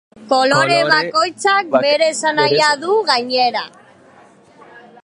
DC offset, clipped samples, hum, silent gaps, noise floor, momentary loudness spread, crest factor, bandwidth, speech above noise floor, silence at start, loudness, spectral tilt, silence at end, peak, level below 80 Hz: under 0.1%; under 0.1%; none; none; -46 dBFS; 5 LU; 16 dB; 11.5 kHz; 31 dB; 0.2 s; -15 LUFS; -3 dB/octave; 0.25 s; 0 dBFS; -66 dBFS